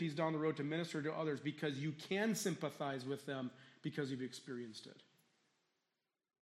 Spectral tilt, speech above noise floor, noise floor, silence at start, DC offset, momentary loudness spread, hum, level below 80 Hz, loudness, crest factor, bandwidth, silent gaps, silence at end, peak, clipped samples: -5 dB/octave; over 48 dB; under -90 dBFS; 0 s; under 0.1%; 11 LU; none; -88 dBFS; -42 LUFS; 18 dB; 13.5 kHz; none; 1.55 s; -24 dBFS; under 0.1%